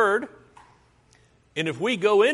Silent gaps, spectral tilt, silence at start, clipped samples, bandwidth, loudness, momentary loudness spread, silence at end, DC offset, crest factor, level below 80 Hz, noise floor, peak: none; -4.5 dB/octave; 0 s; under 0.1%; 11.5 kHz; -24 LUFS; 15 LU; 0 s; under 0.1%; 18 dB; -68 dBFS; -59 dBFS; -8 dBFS